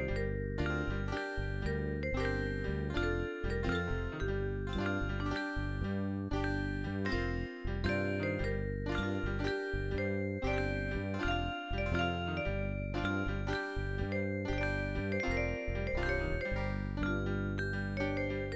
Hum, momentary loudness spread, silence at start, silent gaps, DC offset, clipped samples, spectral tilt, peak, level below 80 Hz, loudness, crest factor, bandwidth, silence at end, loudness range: none; 3 LU; 0 s; none; under 0.1%; under 0.1%; -7 dB/octave; -20 dBFS; -42 dBFS; -36 LUFS; 14 dB; 8 kHz; 0 s; 1 LU